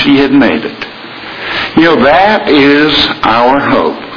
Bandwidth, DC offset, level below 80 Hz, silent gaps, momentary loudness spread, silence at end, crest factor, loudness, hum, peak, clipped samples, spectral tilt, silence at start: 5.4 kHz; under 0.1%; -38 dBFS; none; 15 LU; 0 s; 8 dB; -8 LUFS; none; 0 dBFS; 1%; -6 dB/octave; 0 s